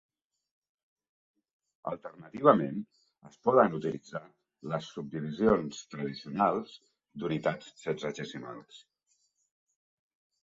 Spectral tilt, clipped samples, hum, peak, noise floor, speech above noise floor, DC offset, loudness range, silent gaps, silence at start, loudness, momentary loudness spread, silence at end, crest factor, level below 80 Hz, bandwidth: -6.5 dB/octave; under 0.1%; none; -6 dBFS; -76 dBFS; 45 dB; under 0.1%; 8 LU; none; 1.85 s; -31 LUFS; 19 LU; 1.65 s; 26 dB; -66 dBFS; 7.8 kHz